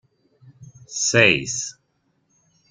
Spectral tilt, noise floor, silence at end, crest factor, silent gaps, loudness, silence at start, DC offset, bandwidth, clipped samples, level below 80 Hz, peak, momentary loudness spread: -2.5 dB/octave; -68 dBFS; 1 s; 22 dB; none; -18 LUFS; 0.6 s; under 0.1%; 10.5 kHz; under 0.1%; -60 dBFS; -2 dBFS; 18 LU